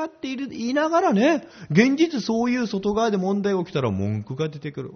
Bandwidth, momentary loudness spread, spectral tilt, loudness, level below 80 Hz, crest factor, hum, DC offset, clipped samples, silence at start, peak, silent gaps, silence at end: 6.6 kHz; 10 LU; -5.5 dB/octave; -23 LUFS; -58 dBFS; 18 dB; none; under 0.1%; under 0.1%; 0 s; -4 dBFS; none; 0 s